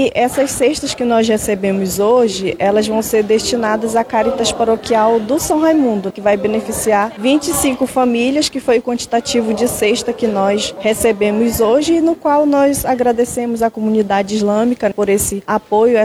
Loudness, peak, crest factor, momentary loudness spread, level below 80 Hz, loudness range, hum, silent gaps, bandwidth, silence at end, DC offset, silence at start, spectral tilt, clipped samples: -15 LUFS; -2 dBFS; 12 dB; 4 LU; -42 dBFS; 1 LU; none; none; 16.5 kHz; 0 s; under 0.1%; 0 s; -4 dB/octave; under 0.1%